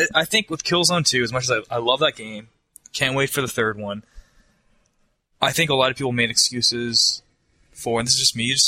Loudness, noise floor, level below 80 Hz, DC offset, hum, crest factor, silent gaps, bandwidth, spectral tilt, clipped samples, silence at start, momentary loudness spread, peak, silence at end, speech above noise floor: -19 LUFS; -66 dBFS; -54 dBFS; under 0.1%; none; 22 dB; none; 16 kHz; -2.5 dB/octave; under 0.1%; 0 s; 14 LU; 0 dBFS; 0 s; 45 dB